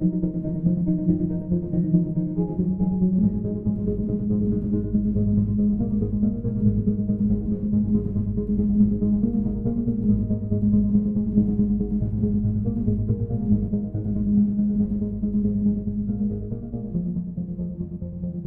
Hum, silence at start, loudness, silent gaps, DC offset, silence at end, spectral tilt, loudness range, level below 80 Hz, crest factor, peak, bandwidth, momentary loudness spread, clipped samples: none; 0 s; -24 LUFS; none; under 0.1%; 0 s; -15 dB/octave; 2 LU; -36 dBFS; 16 dB; -6 dBFS; 1.5 kHz; 6 LU; under 0.1%